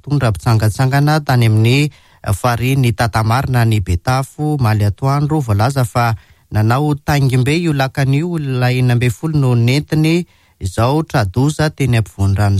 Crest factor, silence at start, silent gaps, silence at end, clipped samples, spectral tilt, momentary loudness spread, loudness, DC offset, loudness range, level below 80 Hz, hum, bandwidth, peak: 10 dB; 0.05 s; none; 0 s; under 0.1%; -6.5 dB/octave; 5 LU; -15 LUFS; under 0.1%; 1 LU; -36 dBFS; none; 15 kHz; -4 dBFS